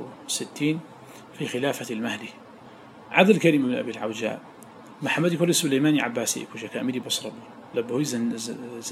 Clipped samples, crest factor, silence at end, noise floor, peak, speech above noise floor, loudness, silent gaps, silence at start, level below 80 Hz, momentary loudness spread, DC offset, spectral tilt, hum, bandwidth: under 0.1%; 22 dB; 0 s; -46 dBFS; -4 dBFS; 22 dB; -25 LUFS; none; 0 s; -76 dBFS; 19 LU; under 0.1%; -4 dB/octave; none; 16 kHz